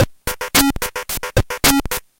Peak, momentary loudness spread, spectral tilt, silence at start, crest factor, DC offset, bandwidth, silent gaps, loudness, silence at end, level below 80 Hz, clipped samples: -2 dBFS; 9 LU; -3 dB/octave; 0 s; 18 dB; under 0.1%; 17.5 kHz; none; -17 LUFS; 0.2 s; -30 dBFS; under 0.1%